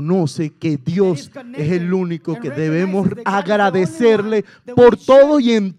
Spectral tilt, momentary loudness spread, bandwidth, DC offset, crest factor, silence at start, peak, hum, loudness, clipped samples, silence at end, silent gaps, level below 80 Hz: -7 dB/octave; 12 LU; 11 kHz; under 0.1%; 16 dB; 0 s; 0 dBFS; none; -16 LUFS; under 0.1%; 0.05 s; none; -54 dBFS